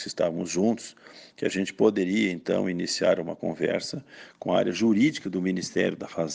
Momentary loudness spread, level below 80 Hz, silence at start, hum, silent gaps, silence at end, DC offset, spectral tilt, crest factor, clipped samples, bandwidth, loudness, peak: 9 LU; -66 dBFS; 0 s; none; none; 0 s; under 0.1%; -5 dB/octave; 18 dB; under 0.1%; 10 kHz; -26 LUFS; -8 dBFS